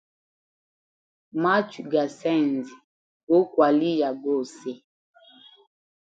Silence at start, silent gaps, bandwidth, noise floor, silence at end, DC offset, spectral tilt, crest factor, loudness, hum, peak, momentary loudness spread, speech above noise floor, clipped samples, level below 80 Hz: 1.35 s; 2.84-3.27 s; 8 kHz; -53 dBFS; 1.35 s; under 0.1%; -6.5 dB/octave; 20 dB; -24 LUFS; none; -6 dBFS; 16 LU; 30 dB; under 0.1%; -78 dBFS